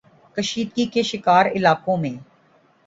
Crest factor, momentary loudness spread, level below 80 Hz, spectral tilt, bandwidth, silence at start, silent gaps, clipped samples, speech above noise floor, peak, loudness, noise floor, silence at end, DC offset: 18 dB; 13 LU; -60 dBFS; -5 dB/octave; 8 kHz; 0.35 s; none; under 0.1%; 38 dB; -2 dBFS; -20 LUFS; -57 dBFS; 0.65 s; under 0.1%